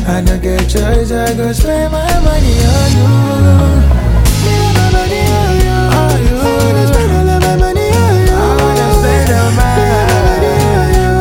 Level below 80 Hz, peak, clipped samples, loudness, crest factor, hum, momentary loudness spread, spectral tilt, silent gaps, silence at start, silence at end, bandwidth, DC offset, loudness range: -14 dBFS; 0 dBFS; under 0.1%; -11 LUFS; 8 dB; none; 4 LU; -6 dB/octave; none; 0 s; 0 s; 17.5 kHz; under 0.1%; 1 LU